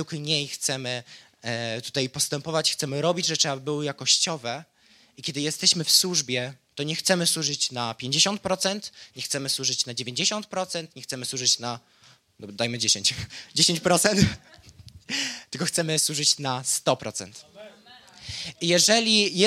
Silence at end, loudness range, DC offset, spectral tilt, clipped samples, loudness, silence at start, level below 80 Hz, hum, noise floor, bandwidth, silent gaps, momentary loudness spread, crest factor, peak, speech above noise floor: 0 s; 3 LU; under 0.1%; -2.5 dB/octave; under 0.1%; -24 LUFS; 0 s; -58 dBFS; none; -51 dBFS; 16 kHz; none; 15 LU; 22 dB; -4 dBFS; 25 dB